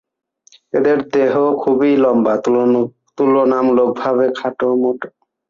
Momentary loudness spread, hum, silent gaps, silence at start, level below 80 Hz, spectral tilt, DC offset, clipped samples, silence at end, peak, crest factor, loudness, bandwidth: 6 LU; none; none; 0.75 s; -60 dBFS; -7 dB/octave; under 0.1%; under 0.1%; 0.4 s; -4 dBFS; 12 dB; -15 LUFS; 7.4 kHz